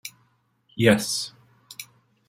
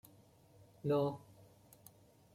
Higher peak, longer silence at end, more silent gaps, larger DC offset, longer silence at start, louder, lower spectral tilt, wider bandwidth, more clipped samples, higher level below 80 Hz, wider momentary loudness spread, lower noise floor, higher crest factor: first, -4 dBFS vs -24 dBFS; second, 0.45 s vs 1.15 s; neither; neither; second, 0.05 s vs 0.85 s; first, -23 LUFS vs -37 LUFS; second, -4.5 dB/octave vs -8 dB/octave; about the same, 16.5 kHz vs 16.5 kHz; neither; first, -64 dBFS vs -76 dBFS; second, 22 LU vs 25 LU; about the same, -66 dBFS vs -65 dBFS; first, 24 dB vs 18 dB